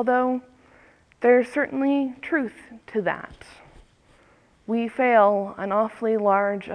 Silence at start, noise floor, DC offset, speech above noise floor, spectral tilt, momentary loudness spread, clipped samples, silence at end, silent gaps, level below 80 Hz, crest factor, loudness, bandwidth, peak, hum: 0 s; -58 dBFS; under 0.1%; 35 dB; -7 dB/octave; 13 LU; under 0.1%; 0 s; none; -62 dBFS; 18 dB; -23 LUFS; 10 kHz; -6 dBFS; none